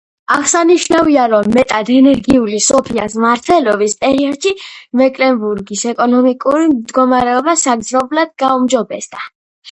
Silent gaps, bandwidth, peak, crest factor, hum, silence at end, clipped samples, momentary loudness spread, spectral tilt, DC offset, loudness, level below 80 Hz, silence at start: 9.35-9.62 s; 11 kHz; 0 dBFS; 12 dB; none; 0 s; under 0.1%; 8 LU; -3.5 dB/octave; under 0.1%; -12 LUFS; -46 dBFS; 0.3 s